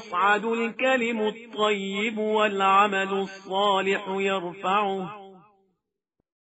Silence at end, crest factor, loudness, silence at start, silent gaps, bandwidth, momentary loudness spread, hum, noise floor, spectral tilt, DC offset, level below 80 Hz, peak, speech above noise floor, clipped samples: 1.2 s; 18 dB; -24 LUFS; 0 s; none; 8 kHz; 9 LU; none; -80 dBFS; -2 dB/octave; under 0.1%; -76 dBFS; -8 dBFS; 55 dB; under 0.1%